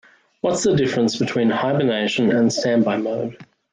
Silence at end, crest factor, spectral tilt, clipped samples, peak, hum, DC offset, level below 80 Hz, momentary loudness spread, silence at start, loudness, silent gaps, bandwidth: 0.3 s; 12 dB; -5 dB/octave; under 0.1%; -8 dBFS; none; under 0.1%; -60 dBFS; 7 LU; 0.45 s; -19 LUFS; none; 9.6 kHz